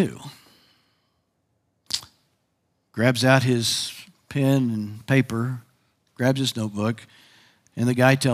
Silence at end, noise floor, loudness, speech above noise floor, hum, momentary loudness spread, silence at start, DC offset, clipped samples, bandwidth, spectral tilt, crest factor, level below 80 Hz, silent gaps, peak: 0 s; -72 dBFS; -23 LUFS; 50 dB; none; 18 LU; 0 s; under 0.1%; under 0.1%; 16 kHz; -5 dB/octave; 24 dB; -66 dBFS; none; -2 dBFS